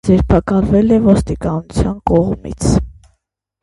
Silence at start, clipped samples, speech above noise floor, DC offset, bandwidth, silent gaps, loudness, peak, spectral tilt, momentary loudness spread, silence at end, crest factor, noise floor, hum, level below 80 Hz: 0.05 s; under 0.1%; 54 dB; under 0.1%; 11.5 kHz; none; -14 LUFS; 0 dBFS; -7.5 dB/octave; 8 LU; 0.7 s; 14 dB; -67 dBFS; none; -26 dBFS